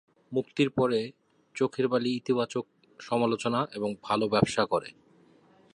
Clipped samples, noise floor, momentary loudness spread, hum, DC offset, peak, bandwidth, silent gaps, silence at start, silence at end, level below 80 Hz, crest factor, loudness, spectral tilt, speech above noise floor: under 0.1%; -60 dBFS; 12 LU; none; under 0.1%; -8 dBFS; 11 kHz; none; 0.3 s; 0.85 s; -64 dBFS; 20 dB; -29 LUFS; -5.5 dB/octave; 32 dB